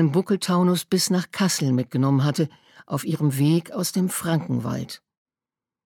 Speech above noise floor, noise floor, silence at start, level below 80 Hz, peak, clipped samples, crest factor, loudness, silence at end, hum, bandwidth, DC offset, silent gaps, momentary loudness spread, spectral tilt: over 68 dB; under -90 dBFS; 0 s; -66 dBFS; -8 dBFS; under 0.1%; 14 dB; -23 LUFS; 0.9 s; none; 19 kHz; under 0.1%; none; 9 LU; -5.5 dB/octave